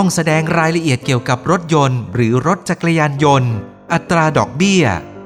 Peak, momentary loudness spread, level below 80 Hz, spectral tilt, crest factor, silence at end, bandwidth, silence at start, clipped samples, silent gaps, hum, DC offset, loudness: 0 dBFS; 4 LU; -46 dBFS; -5.5 dB/octave; 14 dB; 0 s; 14 kHz; 0 s; under 0.1%; none; none; under 0.1%; -15 LUFS